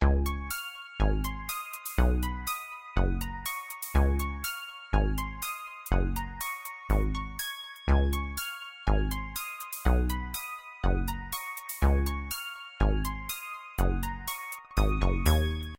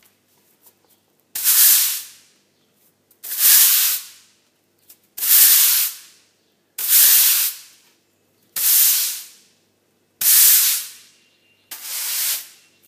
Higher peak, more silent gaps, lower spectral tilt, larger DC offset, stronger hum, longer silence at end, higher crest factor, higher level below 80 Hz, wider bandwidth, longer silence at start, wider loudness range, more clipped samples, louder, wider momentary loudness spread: second, -10 dBFS vs 0 dBFS; neither; first, -5 dB/octave vs 5 dB/octave; neither; neither; second, 0.05 s vs 0.45 s; about the same, 20 dB vs 20 dB; first, -30 dBFS vs -86 dBFS; about the same, 17 kHz vs 16 kHz; second, 0 s vs 1.35 s; second, 1 LU vs 4 LU; neither; second, -31 LUFS vs -13 LUFS; second, 9 LU vs 19 LU